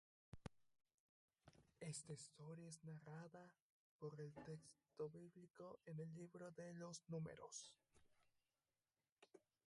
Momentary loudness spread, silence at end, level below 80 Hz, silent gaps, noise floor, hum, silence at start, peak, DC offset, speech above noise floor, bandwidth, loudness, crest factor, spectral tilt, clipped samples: 9 LU; 0.25 s; -84 dBFS; 0.94-1.28 s, 3.62-3.99 s, 9.12-9.17 s; under -90 dBFS; none; 0.35 s; -38 dBFS; under 0.1%; over 33 dB; 11.5 kHz; -57 LUFS; 22 dB; -5 dB/octave; under 0.1%